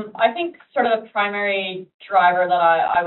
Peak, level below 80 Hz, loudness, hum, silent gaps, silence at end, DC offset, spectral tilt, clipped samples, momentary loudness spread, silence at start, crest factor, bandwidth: -4 dBFS; -66 dBFS; -19 LUFS; none; 1.94-1.99 s; 0 s; under 0.1%; -1 dB/octave; under 0.1%; 10 LU; 0 s; 16 dB; 4.2 kHz